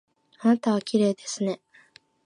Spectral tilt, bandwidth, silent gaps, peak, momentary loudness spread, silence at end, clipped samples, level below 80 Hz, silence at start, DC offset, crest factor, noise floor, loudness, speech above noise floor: -5.5 dB/octave; 10.5 kHz; none; -10 dBFS; 7 LU; 0.7 s; under 0.1%; -76 dBFS; 0.4 s; under 0.1%; 18 dB; -57 dBFS; -25 LUFS; 33 dB